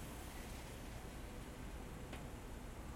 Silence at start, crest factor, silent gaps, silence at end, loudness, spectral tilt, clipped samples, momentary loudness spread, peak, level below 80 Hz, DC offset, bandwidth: 0 s; 14 dB; none; 0 s; -51 LUFS; -5 dB/octave; under 0.1%; 1 LU; -36 dBFS; -54 dBFS; under 0.1%; 16.5 kHz